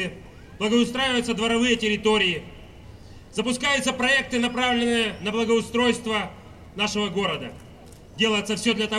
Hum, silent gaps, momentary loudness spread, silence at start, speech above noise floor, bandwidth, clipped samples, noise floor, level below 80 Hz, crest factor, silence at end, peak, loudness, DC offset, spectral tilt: none; none; 11 LU; 0 s; 22 dB; 14 kHz; under 0.1%; -45 dBFS; -50 dBFS; 16 dB; 0 s; -8 dBFS; -23 LUFS; 0.1%; -3.5 dB/octave